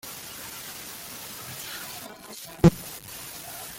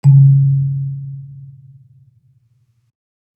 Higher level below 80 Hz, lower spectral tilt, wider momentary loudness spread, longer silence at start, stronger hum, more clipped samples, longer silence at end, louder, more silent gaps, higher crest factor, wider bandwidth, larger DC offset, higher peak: first, -48 dBFS vs -64 dBFS; second, -5.5 dB/octave vs -11.5 dB/octave; second, 17 LU vs 26 LU; about the same, 0.05 s vs 0.05 s; neither; neither; second, 0 s vs 1.9 s; second, -30 LUFS vs -13 LUFS; neither; first, 26 dB vs 14 dB; first, 17 kHz vs 1 kHz; neither; about the same, -4 dBFS vs -2 dBFS